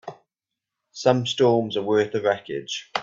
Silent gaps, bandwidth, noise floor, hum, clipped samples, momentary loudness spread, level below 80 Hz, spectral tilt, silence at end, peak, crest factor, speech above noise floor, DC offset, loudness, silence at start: none; 7.8 kHz; -86 dBFS; none; under 0.1%; 10 LU; -64 dBFS; -5 dB/octave; 0 s; -4 dBFS; 20 dB; 64 dB; under 0.1%; -23 LUFS; 0.05 s